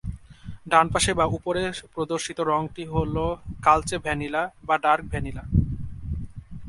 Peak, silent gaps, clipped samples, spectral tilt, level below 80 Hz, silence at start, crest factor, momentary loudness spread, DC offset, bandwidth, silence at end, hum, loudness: -2 dBFS; none; under 0.1%; -4.5 dB/octave; -38 dBFS; 0.05 s; 22 dB; 14 LU; under 0.1%; 11.5 kHz; 0 s; none; -25 LUFS